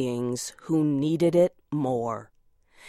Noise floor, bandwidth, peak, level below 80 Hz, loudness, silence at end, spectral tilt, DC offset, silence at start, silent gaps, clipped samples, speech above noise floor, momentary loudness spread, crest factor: -58 dBFS; 14.5 kHz; -10 dBFS; -64 dBFS; -26 LUFS; 0 s; -6.5 dB/octave; under 0.1%; 0 s; none; under 0.1%; 32 dB; 11 LU; 16 dB